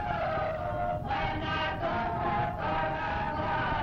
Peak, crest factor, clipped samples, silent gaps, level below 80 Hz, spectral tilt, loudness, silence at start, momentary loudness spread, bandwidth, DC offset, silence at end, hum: -18 dBFS; 12 dB; under 0.1%; none; -44 dBFS; -7 dB/octave; -31 LUFS; 0 s; 2 LU; 7.6 kHz; under 0.1%; 0 s; none